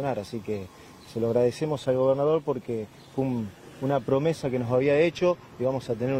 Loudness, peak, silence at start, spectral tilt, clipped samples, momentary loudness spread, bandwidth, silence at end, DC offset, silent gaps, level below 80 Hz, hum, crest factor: -27 LUFS; -10 dBFS; 0 s; -7 dB/octave; under 0.1%; 12 LU; 15 kHz; 0 s; under 0.1%; none; -60 dBFS; none; 16 dB